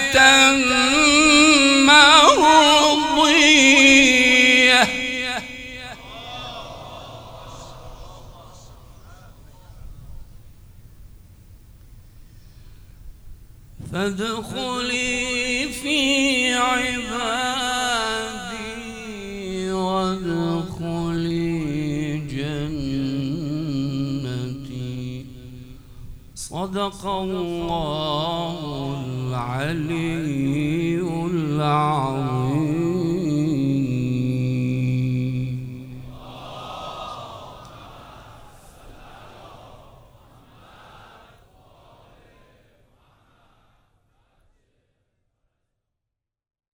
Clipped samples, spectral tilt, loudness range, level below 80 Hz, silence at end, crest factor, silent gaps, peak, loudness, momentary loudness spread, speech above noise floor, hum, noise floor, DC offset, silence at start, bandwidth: under 0.1%; -3.5 dB/octave; 22 LU; -46 dBFS; 7 s; 22 dB; none; 0 dBFS; -18 LUFS; 23 LU; 68 dB; none; -85 dBFS; under 0.1%; 0 s; over 20 kHz